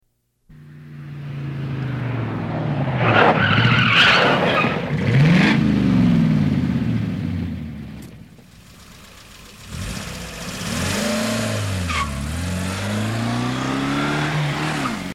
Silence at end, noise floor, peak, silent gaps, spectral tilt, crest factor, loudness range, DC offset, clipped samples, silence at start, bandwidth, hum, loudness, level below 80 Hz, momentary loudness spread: 0 s; -61 dBFS; -2 dBFS; none; -5.5 dB/octave; 18 dB; 14 LU; under 0.1%; under 0.1%; 0.5 s; 15.5 kHz; none; -19 LUFS; -40 dBFS; 17 LU